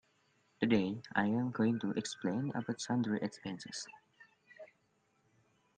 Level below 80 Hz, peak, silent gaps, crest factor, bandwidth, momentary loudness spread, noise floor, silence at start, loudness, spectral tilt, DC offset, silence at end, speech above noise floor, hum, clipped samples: -72 dBFS; -16 dBFS; none; 22 dB; 9.8 kHz; 13 LU; -76 dBFS; 0.6 s; -36 LUFS; -5.5 dB/octave; under 0.1%; 1.15 s; 40 dB; none; under 0.1%